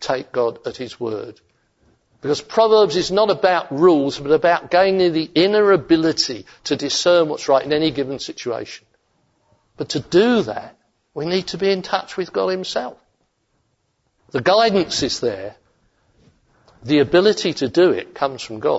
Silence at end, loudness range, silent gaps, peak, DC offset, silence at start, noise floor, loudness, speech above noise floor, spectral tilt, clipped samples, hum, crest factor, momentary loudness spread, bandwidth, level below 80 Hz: 0 s; 7 LU; none; -2 dBFS; under 0.1%; 0 s; -68 dBFS; -18 LUFS; 50 dB; -4.5 dB/octave; under 0.1%; none; 16 dB; 14 LU; 8 kHz; -56 dBFS